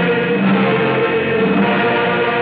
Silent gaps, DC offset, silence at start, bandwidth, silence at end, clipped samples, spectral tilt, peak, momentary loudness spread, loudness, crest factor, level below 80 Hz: none; under 0.1%; 0 s; 4.9 kHz; 0 s; under 0.1%; -4.5 dB/octave; -2 dBFS; 1 LU; -15 LUFS; 12 dB; -54 dBFS